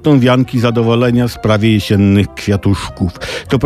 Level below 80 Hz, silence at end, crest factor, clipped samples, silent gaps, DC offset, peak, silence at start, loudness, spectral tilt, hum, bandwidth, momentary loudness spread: -36 dBFS; 0 s; 10 dB; under 0.1%; none; under 0.1%; -2 dBFS; 0 s; -13 LUFS; -7 dB/octave; none; 14.5 kHz; 8 LU